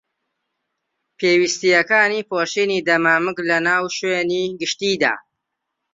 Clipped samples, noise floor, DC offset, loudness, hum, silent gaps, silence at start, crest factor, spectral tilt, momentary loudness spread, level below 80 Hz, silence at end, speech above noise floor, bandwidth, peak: under 0.1%; -78 dBFS; under 0.1%; -18 LUFS; none; none; 1.2 s; 18 dB; -3 dB/octave; 6 LU; -66 dBFS; 0.75 s; 60 dB; 7.8 kHz; -2 dBFS